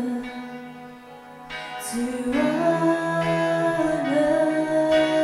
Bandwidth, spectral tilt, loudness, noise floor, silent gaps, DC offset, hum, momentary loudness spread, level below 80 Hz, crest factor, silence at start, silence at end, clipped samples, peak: 15 kHz; -5.5 dB/octave; -23 LUFS; -43 dBFS; none; under 0.1%; none; 20 LU; -54 dBFS; 14 dB; 0 s; 0 s; under 0.1%; -10 dBFS